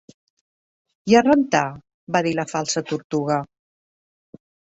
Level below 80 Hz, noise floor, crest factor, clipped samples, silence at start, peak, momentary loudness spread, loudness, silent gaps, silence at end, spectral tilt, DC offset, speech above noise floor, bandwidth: -62 dBFS; under -90 dBFS; 22 dB; under 0.1%; 1.05 s; -2 dBFS; 15 LU; -21 LUFS; 1.94-2.07 s, 3.04-3.10 s; 1.25 s; -5 dB/octave; under 0.1%; over 70 dB; 8.2 kHz